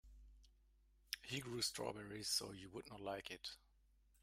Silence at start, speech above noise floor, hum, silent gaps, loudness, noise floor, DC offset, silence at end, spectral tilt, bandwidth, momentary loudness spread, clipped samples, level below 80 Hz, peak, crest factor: 0.05 s; 27 dB; none; none; -46 LUFS; -74 dBFS; under 0.1%; 0.65 s; -2.5 dB/octave; 16 kHz; 12 LU; under 0.1%; -70 dBFS; -24 dBFS; 26 dB